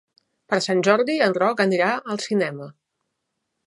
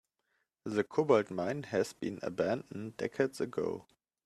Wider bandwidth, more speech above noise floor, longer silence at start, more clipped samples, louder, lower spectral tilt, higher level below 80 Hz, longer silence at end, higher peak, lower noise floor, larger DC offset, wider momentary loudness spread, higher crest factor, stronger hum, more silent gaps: second, 11.5 kHz vs 13.5 kHz; first, 57 dB vs 47 dB; second, 0.5 s vs 0.65 s; neither; first, -21 LUFS vs -34 LUFS; about the same, -5 dB/octave vs -6 dB/octave; about the same, -76 dBFS vs -74 dBFS; first, 0.95 s vs 0.45 s; first, -2 dBFS vs -14 dBFS; about the same, -78 dBFS vs -81 dBFS; neither; about the same, 9 LU vs 10 LU; about the same, 20 dB vs 20 dB; neither; neither